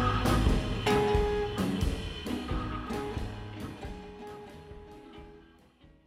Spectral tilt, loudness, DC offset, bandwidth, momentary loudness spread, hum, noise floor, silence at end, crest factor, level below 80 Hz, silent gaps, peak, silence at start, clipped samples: -6 dB/octave; -31 LUFS; under 0.1%; 16 kHz; 22 LU; none; -59 dBFS; 0.65 s; 18 dB; -38 dBFS; none; -14 dBFS; 0 s; under 0.1%